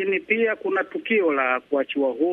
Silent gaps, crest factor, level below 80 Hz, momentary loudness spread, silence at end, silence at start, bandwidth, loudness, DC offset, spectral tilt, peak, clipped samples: none; 18 dB; -72 dBFS; 4 LU; 0 s; 0 s; 4 kHz; -23 LUFS; under 0.1%; -7 dB/octave; -6 dBFS; under 0.1%